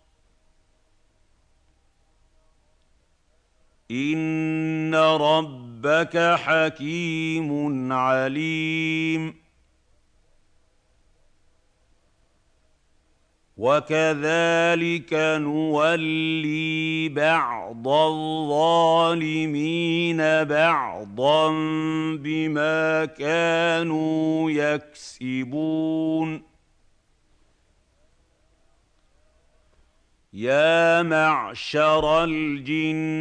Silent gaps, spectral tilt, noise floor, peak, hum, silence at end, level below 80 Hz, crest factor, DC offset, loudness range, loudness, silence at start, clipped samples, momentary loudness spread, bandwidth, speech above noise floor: none; -5.5 dB/octave; -64 dBFS; -6 dBFS; none; 0 s; -60 dBFS; 18 dB; under 0.1%; 9 LU; -22 LUFS; 3.9 s; under 0.1%; 8 LU; 9.2 kHz; 42 dB